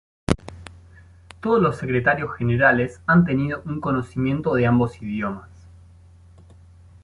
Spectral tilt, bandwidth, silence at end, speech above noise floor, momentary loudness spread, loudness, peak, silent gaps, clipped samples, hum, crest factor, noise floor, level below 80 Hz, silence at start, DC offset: -8 dB/octave; 11.5 kHz; 1.35 s; 28 dB; 11 LU; -21 LUFS; -2 dBFS; none; under 0.1%; none; 20 dB; -48 dBFS; -44 dBFS; 0.3 s; under 0.1%